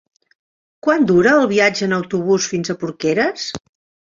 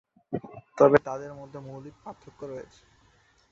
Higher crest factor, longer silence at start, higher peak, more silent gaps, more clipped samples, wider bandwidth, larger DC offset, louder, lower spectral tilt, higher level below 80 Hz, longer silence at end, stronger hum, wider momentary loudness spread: second, 16 dB vs 26 dB; first, 0.85 s vs 0.3 s; about the same, -2 dBFS vs -4 dBFS; neither; neither; about the same, 7.6 kHz vs 7.6 kHz; neither; first, -17 LUFS vs -25 LUFS; second, -4.5 dB/octave vs -7.5 dB/octave; first, -56 dBFS vs -64 dBFS; second, 0.45 s vs 0.9 s; neither; second, 11 LU vs 24 LU